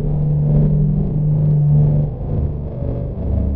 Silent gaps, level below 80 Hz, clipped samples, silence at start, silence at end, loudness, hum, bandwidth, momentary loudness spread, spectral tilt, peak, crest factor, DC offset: none; -24 dBFS; under 0.1%; 0 s; 0 s; -17 LUFS; none; 1.4 kHz; 10 LU; -14.5 dB/octave; -4 dBFS; 12 dB; under 0.1%